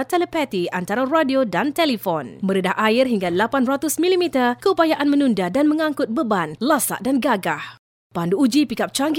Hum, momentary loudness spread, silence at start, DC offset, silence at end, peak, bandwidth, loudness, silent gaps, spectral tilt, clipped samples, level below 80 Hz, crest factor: none; 6 LU; 0 s; under 0.1%; 0 s; -4 dBFS; 17 kHz; -20 LUFS; 7.79-8.10 s; -4.5 dB/octave; under 0.1%; -60 dBFS; 16 dB